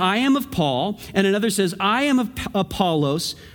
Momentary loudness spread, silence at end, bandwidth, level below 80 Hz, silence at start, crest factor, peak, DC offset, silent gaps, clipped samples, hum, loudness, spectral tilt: 6 LU; 0.05 s; over 20 kHz; -48 dBFS; 0 s; 18 dB; -2 dBFS; under 0.1%; none; under 0.1%; none; -21 LUFS; -5 dB/octave